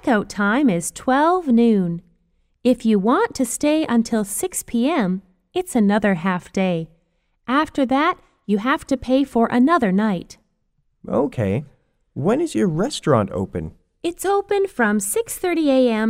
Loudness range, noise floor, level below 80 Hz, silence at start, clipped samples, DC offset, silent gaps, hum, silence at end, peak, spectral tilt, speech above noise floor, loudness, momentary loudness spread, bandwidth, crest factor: 3 LU; -67 dBFS; -50 dBFS; 0.05 s; under 0.1%; under 0.1%; none; none; 0 s; -4 dBFS; -5.5 dB/octave; 48 dB; -20 LUFS; 10 LU; 16 kHz; 16 dB